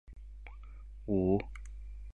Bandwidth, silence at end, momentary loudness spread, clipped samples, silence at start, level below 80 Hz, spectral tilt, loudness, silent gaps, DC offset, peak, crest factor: 9 kHz; 0 s; 22 LU; under 0.1%; 0.05 s; -46 dBFS; -9.5 dB/octave; -33 LUFS; none; 0.2%; -18 dBFS; 18 dB